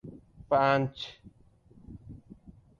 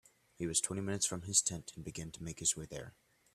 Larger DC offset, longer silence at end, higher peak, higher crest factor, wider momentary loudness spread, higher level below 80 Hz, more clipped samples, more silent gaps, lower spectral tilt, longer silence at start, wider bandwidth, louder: neither; about the same, 0.45 s vs 0.45 s; about the same, -12 dBFS vs -14 dBFS; about the same, 20 dB vs 24 dB; first, 25 LU vs 15 LU; first, -58 dBFS vs -64 dBFS; neither; neither; first, -7 dB/octave vs -2.5 dB/octave; second, 0.05 s vs 0.4 s; second, 7.4 kHz vs 15 kHz; first, -28 LUFS vs -35 LUFS